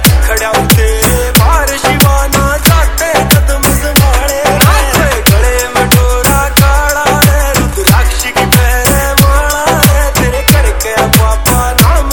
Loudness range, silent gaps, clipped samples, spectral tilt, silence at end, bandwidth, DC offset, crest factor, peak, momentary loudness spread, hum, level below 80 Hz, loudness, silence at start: 0 LU; none; 1%; -4 dB/octave; 0 s; over 20 kHz; under 0.1%; 8 dB; 0 dBFS; 3 LU; none; -12 dBFS; -8 LUFS; 0 s